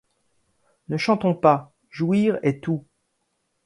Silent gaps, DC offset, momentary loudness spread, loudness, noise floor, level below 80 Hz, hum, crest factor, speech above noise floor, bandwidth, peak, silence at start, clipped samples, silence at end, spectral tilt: none; under 0.1%; 11 LU; -22 LUFS; -73 dBFS; -64 dBFS; none; 22 dB; 52 dB; 11.5 kHz; -2 dBFS; 0.9 s; under 0.1%; 0.85 s; -7.5 dB/octave